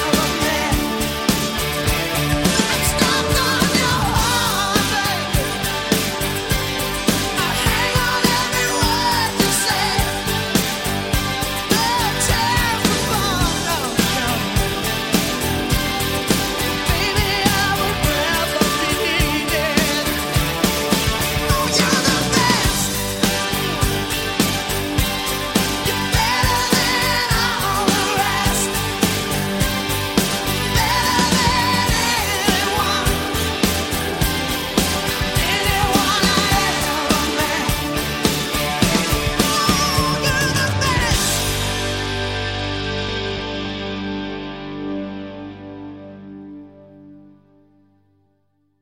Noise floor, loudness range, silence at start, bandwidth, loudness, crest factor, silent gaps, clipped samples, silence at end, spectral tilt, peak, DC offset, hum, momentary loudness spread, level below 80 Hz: -65 dBFS; 3 LU; 0 s; 17 kHz; -18 LUFS; 18 dB; none; under 0.1%; 1.6 s; -3 dB/octave; 0 dBFS; under 0.1%; 50 Hz at -45 dBFS; 6 LU; -30 dBFS